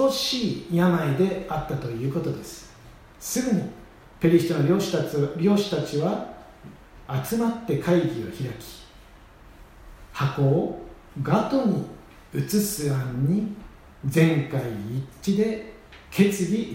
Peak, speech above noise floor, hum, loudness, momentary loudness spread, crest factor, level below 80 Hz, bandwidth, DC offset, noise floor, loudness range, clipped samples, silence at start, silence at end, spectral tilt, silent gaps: -6 dBFS; 25 dB; none; -25 LUFS; 16 LU; 20 dB; -50 dBFS; 16 kHz; under 0.1%; -49 dBFS; 4 LU; under 0.1%; 0 s; 0 s; -6 dB/octave; none